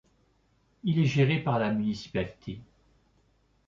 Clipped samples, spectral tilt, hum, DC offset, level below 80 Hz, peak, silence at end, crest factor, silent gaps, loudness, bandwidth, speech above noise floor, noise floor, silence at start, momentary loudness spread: under 0.1%; -7.5 dB/octave; none; under 0.1%; -58 dBFS; -12 dBFS; 1.05 s; 18 dB; none; -28 LUFS; 7.4 kHz; 41 dB; -68 dBFS; 0.85 s; 18 LU